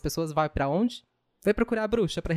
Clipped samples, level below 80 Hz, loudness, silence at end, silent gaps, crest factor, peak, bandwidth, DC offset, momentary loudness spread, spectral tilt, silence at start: under 0.1%; -44 dBFS; -27 LUFS; 0 s; none; 18 dB; -10 dBFS; 15.5 kHz; under 0.1%; 4 LU; -6 dB/octave; 0.05 s